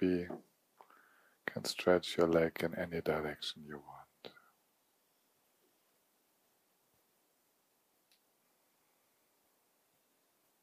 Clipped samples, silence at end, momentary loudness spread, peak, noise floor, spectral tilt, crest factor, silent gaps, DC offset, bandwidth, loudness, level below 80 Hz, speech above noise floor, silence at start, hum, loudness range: under 0.1%; 6.35 s; 24 LU; -16 dBFS; -77 dBFS; -5 dB/octave; 24 dB; none; under 0.1%; 15.5 kHz; -35 LUFS; -70 dBFS; 42 dB; 0 s; none; 14 LU